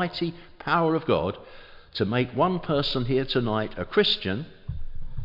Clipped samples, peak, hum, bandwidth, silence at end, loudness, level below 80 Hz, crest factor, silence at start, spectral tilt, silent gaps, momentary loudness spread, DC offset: under 0.1%; -8 dBFS; none; 5.8 kHz; 0 s; -25 LUFS; -42 dBFS; 18 dB; 0 s; -7.5 dB/octave; none; 15 LU; under 0.1%